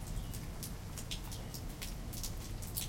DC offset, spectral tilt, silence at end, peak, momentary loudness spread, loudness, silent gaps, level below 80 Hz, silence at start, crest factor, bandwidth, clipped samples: under 0.1%; -3.5 dB/octave; 0 s; -18 dBFS; 2 LU; -44 LUFS; none; -46 dBFS; 0 s; 24 dB; 17 kHz; under 0.1%